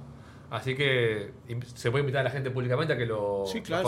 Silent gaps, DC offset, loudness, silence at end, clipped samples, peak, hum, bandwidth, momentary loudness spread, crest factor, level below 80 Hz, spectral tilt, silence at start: none; under 0.1%; -29 LUFS; 0 s; under 0.1%; -12 dBFS; none; 14 kHz; 13 LU; 18 dB; -60 dBFS; -6 dB/octave; 0 s